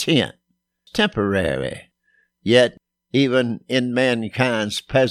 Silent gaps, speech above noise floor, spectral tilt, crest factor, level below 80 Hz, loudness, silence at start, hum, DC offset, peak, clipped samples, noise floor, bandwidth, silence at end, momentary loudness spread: none; 45 dB; -5 dB/octave; 18 dB; -50 dBFS; -20 LUFS; 0 s; none; under 0.1%; -2 dBFS; under 0.1%; -64 dBFS; 14.5 kHz; 0 s; 11 LU